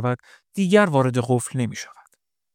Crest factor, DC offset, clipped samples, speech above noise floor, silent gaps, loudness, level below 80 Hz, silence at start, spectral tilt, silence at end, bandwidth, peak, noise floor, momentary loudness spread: 20 dB; under 0.1%; under 0.1%; 44 dB; none; -21 LUFS; -66 dBFS; 0 s; -6 dB/octave; 0.7 s; 16 kHz; -2 dBFS; -65 dBFS; 18 LU